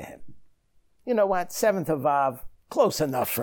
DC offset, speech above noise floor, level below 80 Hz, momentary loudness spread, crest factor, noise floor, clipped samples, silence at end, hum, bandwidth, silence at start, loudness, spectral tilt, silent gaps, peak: under 0.1%; 40 dB; -56 dBFS; 14 LU; 18 dB; -64 dBFS; under 0.1%; 0 s; none; over 20 kHz; 0 s; -25 LUFS; -4.5 dB/octave; none; -10 dBFS